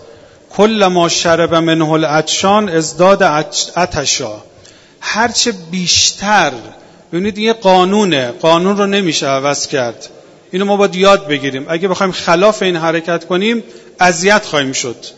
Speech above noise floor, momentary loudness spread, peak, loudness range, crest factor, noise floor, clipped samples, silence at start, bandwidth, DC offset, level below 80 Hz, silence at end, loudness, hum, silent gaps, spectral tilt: 29 dB; 9 LU; 0 dBFS; 2 LU; 14 dB; -42 dBFS; 0.2%; 0.05 s; 10 kHz; under 0.1%; -48 dBFS; 0.05 s; -12 LUFS; none; none; -3.5 dB/octave